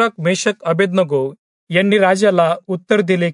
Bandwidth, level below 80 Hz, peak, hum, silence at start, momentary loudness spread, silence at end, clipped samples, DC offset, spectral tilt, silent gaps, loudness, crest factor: 11 kHz; -68 dBFS; -2 dBFS; none; 0 s; 7 LU; 0 s; under 0.1%; under 0.1%; -5.5 dB/octave; 1.39-1.67 s; -16 LUFS; 14 dB